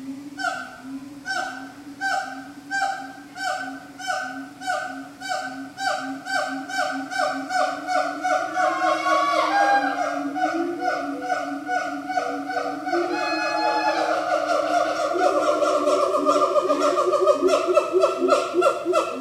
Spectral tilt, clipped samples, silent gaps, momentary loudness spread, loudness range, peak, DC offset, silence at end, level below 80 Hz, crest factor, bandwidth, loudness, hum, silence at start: -3 dB/octave; under 0.1%; none; 13 LU; 9 LU; -4 dBFS; under 0.1%; 0 s; -68 dBFS; 20 dB; 15.5 kHz; -23 LUFS; none; 0 s